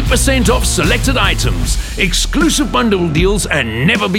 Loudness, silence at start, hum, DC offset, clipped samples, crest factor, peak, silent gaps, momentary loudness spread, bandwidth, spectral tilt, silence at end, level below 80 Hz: -13 LUFS; 0 s; none; under 0.1%; under 0.1%; 12 dB; 0 dBFS; none; 4 LU; 17 kHz; -4 dB/octave; 0 s; -18 dBFS